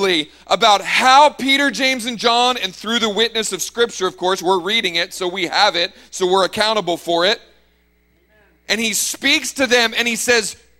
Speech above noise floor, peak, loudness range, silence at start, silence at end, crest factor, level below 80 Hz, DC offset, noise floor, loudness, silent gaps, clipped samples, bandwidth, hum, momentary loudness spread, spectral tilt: 41 dB; 0 dBFS; 4 LU; 0 s; 0.25 s; 18 dB; -56 dBFS; under 0.1%; -58 dBFS; -16 LUFS; none; under 0.1%; 16.5 kHz; none; 8 LU; -1.5 dB/octave